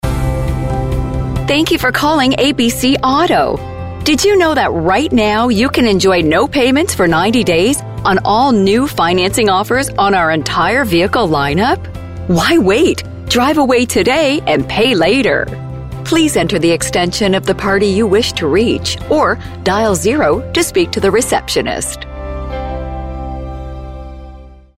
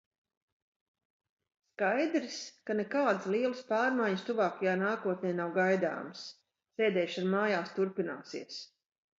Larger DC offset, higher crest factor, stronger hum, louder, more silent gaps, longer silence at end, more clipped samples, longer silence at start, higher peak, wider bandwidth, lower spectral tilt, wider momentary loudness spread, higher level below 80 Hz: first, 0.5% vs under 0.1%; second, 10 dB vs 18 dB; neither; first, -13 LUFS vs -32 LUFS; neither; second, 0.25 s vs 0.55 s; neither; second, 0.05 s vs 1.8 s; first, -2 dBFS vs -16 dBFS; first, 16 kHz vs 7.8 kHz; about the same, -4.5 dB/octave vs -5.5 dB/octave; about the same, 12 LU vs 13 LU; first, -28 dBFS vs -84 dBFS